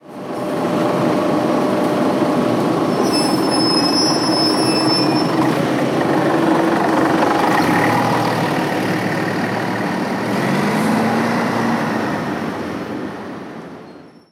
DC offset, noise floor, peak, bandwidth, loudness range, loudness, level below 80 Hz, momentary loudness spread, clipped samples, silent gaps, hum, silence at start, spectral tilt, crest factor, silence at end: under 0.1%; -39 dBFS; -2 dBFS; 16.5 kHz; 4 LU; -17 LUFS; -56 dBFS; 10 LU; under 0.1%; none; none; 0.05 s; -5 dB/octave; 14 dB; 0.25 s